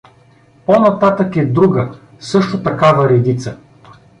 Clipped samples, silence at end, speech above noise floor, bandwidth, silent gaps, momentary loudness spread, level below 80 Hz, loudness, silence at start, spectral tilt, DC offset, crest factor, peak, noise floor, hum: under 0.1%; 0.3 s; 35 dB; 10.5 kHz; none; 13 LU; -50 dBFS; -13 LUFS; 0.7 s; -7.5 dB/octave; under 0.1%; 14 dB; -2 dBFS; -48 dBFS; none